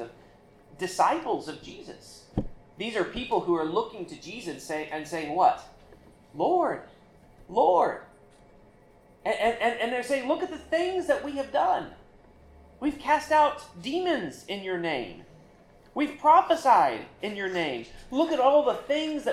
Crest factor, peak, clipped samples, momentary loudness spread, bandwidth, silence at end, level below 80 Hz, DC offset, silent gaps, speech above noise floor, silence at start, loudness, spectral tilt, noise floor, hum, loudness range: 20 dB; -8 dBFS; under 0.1%; 16 LU; 14.5 kHz; 0 s; -56 dBFS; under 0.1%; none; 30 dB; 0 s; -27 LUFS; -4.5 dB/octave; -56 dBFS; none; 6 LU